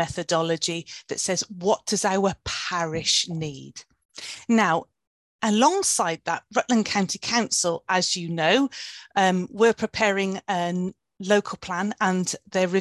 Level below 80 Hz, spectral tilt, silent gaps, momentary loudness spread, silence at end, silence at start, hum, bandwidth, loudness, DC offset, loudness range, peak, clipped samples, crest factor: -58 dBFS; -3.5 dB/octave; 4.05-4.09 s, 5.07-5.39 s; 11 LU; 0 s; 0 s; none; 12.5 kHz; -24 LUFS; under 0.1%; 2 LU; -6 dBFS; under 0.1%; 18 dB